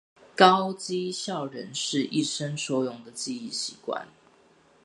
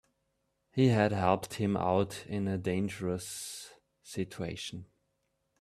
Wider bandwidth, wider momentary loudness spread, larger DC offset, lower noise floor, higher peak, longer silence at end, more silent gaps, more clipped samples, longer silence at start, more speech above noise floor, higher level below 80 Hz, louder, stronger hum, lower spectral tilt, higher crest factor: second, 11.5 kHz vs 14 kHz; about the same, 16 LU vs 14 LU; neither; second, -60 dBFS vs -79 dBFS; first, -2 dBFS vs -10 dBFS; about the same, 0.8 s vs 0.75 s; neither; neither; second, 0.35 s vs 0.75 s; second, 33 dB vs 48 dB; second, -76 dBFS vs -66 dBFS; first, -27 LUFS vs -32 LUFS; neither; second, -3.5 dB/octave vs -6 dB/octave; about the same, 26 dB vs 22 dB